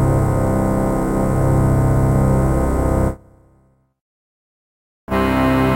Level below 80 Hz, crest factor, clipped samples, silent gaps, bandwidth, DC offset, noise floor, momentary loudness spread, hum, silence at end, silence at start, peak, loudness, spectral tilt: -26 dBFS; 14 dB; under 0.1%; 4.01-5.07 s; 16 kHz; under 0.1%; -57 dBFS; 4 LU; 50 Hz at -45 dBFS; 0 s; 0 s; -4 dBFS; -17 LUFS; -8 dB/octave